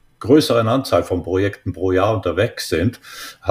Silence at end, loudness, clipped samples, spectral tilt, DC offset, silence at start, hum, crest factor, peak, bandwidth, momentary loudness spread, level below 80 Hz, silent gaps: 0 s; -18 LUFS; under 0.1%; -6 dB/octave; under 0.1%; 0.2 s; none; 18 dB; -2 dBFS; 15.5 kHz; 9 LU; -44 dBFS; none